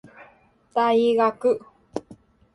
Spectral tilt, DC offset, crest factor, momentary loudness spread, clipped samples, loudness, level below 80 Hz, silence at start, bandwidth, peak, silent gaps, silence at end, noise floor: -5.5 dB/octave; under 0.1%; 16 dB; 17 LU; under 0.1%; -22 LUFS; -66 dBFS; 0.2 s; 11 kHz; -8 dBFS; none; 0.4 s; -56 dBFS